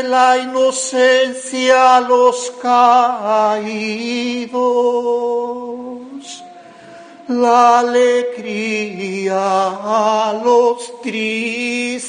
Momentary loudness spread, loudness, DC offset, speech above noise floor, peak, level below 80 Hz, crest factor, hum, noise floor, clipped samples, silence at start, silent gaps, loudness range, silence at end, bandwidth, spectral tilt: 13 LU; -15 LUFS; under 0.1%; 23 dB; 0 dBFS; -66 dBFS; 14 dB; none; -38 dBFS; under 0.1%; 0 s; none; 7 LU; 0 s; 10 kHz; -3 dB/octave